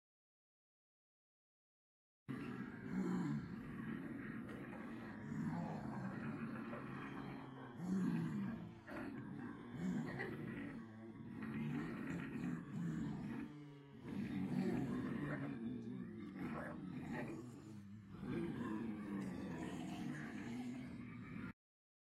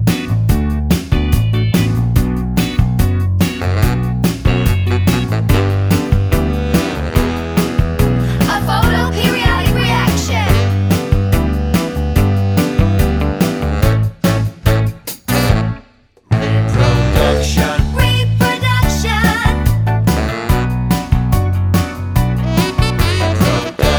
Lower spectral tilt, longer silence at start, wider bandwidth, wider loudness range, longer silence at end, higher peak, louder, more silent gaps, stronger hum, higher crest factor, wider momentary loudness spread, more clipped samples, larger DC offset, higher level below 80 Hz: first, -7.5 dB/octave vs -6 dB/octave; first, 2.3 s vs 0 s; second, 13 kHz vs over 20 kHz; about the same, 3 LU vs 2 LU; first, 0.65 s vs 0 s; second, -30 dBFS vs 0 dBFS; second, -47 LUFS vs -15 LUFS; neither; neither; about the same, 18 dB vs 14 dB; first, 10 LU vs 3 LU; neither; neither; second, -72 dBFS vs -20 dBFS